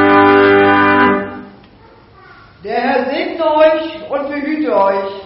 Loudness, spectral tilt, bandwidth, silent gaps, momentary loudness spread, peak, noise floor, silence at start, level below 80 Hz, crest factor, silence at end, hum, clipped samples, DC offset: -12 LUFS; -3 dB/octave; 5.8 kHz; none; 13 LU; 0 dBFS; -43 dBFS; 0 s; -50 dBFS; 12 dB; 0 s; none; under 0.1%; under 0.1%